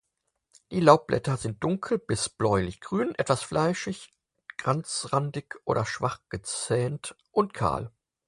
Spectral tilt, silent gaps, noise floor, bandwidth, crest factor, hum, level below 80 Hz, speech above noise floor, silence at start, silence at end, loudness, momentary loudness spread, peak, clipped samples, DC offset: -5 dB/octave; none; -78 dBFS; 11.5 kHz; 26 dB; none; -54 dBFS; 51 dB; 0.7 s; 0.4 s; -27 LUFS; 11 LU; -2 dBFS; under 0.1%; under 0.1%